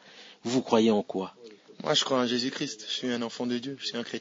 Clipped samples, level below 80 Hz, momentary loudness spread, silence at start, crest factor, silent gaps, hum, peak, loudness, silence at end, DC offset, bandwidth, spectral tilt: under 0.1%; -78 dBFS; 13 LU; 0.05 s; 20 dB; none; none; -8 dBFS; -28 LUFS; 0 s; under 0.1%; 7.8 kHz; -4 dB/octave